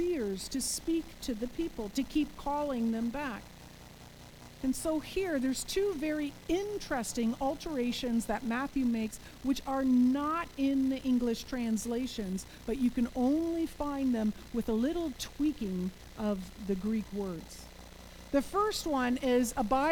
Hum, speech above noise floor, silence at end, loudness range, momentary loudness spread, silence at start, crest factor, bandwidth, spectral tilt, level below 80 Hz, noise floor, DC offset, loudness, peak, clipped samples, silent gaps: none; 19 dB; 0 s; 5 LU; 10 LU; 0 s; 16 dB; over 20 kHz; -4.5 dB/octave; -52 dBFS; -51 dBFS; under 0.1%; -33 LUFS; -16 dBFS; under 0.1%; none